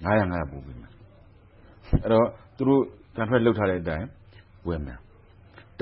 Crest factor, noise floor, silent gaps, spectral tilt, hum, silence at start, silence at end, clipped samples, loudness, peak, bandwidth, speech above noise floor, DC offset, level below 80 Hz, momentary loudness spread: 18 dB; -53 dBFS; none; -11.5 dB/octave; none; 0 s; 0.8 s; under 0.1%; -25 LUFS; -8 dBFS; 5.6 kHz; 29 dB; under 0.1%; -40 dBFS; 18 LU